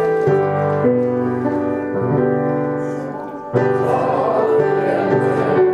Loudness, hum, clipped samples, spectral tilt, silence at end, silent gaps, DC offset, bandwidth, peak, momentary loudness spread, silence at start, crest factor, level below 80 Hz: -18 LUFS; none; under 0.1%; -9 dB/octave; 0 s; none; under 0.1%; 9.8 kHz; -2 dBFS; 6 LU; 0 s; 14 dB; -56 dBFS